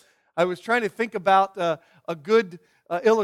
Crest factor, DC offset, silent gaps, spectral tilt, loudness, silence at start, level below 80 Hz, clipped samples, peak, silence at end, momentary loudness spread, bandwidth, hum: 16 dB; under 0.1%; none; -5 dB/octave; -23 LUFS; 0.35 s; -74 dBFS; under 0.1%; -6 dBFS; 0 s; 14 LU; 13 kHz; none